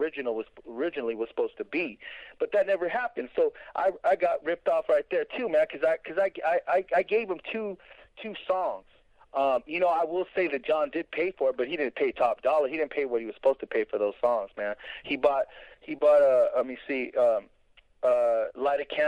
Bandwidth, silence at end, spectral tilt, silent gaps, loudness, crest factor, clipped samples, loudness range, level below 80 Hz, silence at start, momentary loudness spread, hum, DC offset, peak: 8.8 kHz; 0 s; -5.5 dB/octave; none; -28 LUFS; 18 dB; under 0.1%; 4 LU; -66 dBFS; 0 s; 9 LU; none; under 0.1%; -10 dBFS